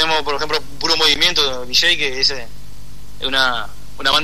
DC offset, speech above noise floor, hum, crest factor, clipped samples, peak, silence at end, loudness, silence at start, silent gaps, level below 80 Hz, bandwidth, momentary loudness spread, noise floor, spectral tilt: 7%; 20 dB; 50 Hz at -40 dBFS; 16 dB; under 0.1%; -2 dBFS; 0 s; -16 LUFS; 0 s; none; -40 dBFS; 13.5 kHz; 12 LU; -38 dBFS; -1 dB/octave